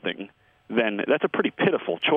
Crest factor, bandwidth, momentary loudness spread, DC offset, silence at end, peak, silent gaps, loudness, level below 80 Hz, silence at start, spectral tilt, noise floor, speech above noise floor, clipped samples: 18 dB; 4.2 kHz; 11 LU; under 0.1%; 0 s; -8 dBFS; none; -24 LUFS; -70 dBFS; 0.05 s; -8 dB/octave; -44 dBFS; 21 dB; under 0.1%